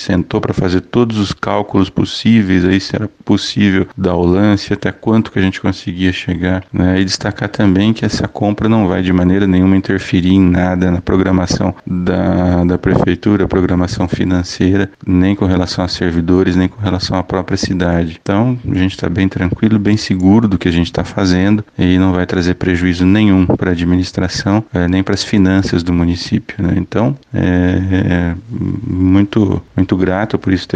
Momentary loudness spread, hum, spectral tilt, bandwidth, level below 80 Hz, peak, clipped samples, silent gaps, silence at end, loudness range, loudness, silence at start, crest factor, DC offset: 6 LU; none; -6.5 dB/octave; 9 kHz; -34 dBFS; 0 dBFS; under 0.1%; none; 0 s; 2 LU; -13 LUFS; 0 s; 12 dB; under 0.1%